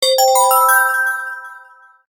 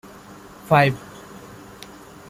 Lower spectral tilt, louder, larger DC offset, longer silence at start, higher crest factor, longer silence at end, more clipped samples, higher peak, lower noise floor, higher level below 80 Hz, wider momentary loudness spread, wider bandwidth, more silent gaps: second, 4 dB/octave vs -6.5 dB/octave; first, -13 LUFS vs -18 LUFS; neither; second, 0 s vs 0.65 s; second, 16 dB vs 22 dB; second, 0.55 s vs 0.9 s; neither; about the same, 0 dBFS vs -2 dBFS; about the same, -44 dBFS vs -43 dBFS; second, -76 dBFS vs -56 dBFS; second, 15 LU vs 25 LU; about the same, 17.5 kHz vs 16 kHz; neither